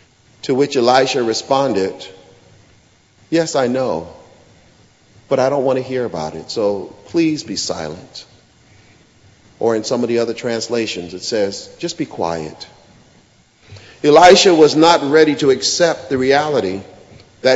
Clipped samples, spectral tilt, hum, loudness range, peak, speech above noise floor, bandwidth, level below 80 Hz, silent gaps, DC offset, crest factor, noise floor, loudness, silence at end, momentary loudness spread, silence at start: under 0.1%; -4 dB/octave; none; 11 LU; 0 dBFS; 36 dB; 8.2 kHz; -54 dBFS; none; under 0.1%; 16 dB; -52 dBFS; -16 LUFS; 0 s; 16 LU; 0.45 s